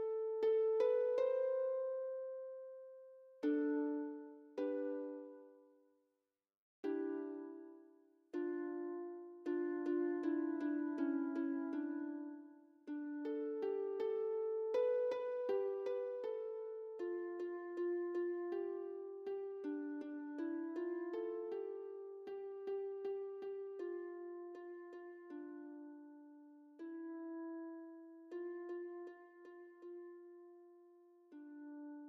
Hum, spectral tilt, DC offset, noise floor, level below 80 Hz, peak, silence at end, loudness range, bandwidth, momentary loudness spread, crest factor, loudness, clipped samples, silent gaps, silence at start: none; -3.5 dB/octave; under 0.1%; under -90 dBFS; under -90 dBFS; -26 dBFS; 0 s; 11 LU; 6.4 kHz; 19 LU; 18 dB; -42 LUFS; under 0.1%; 6.57-6.83 s; 0 s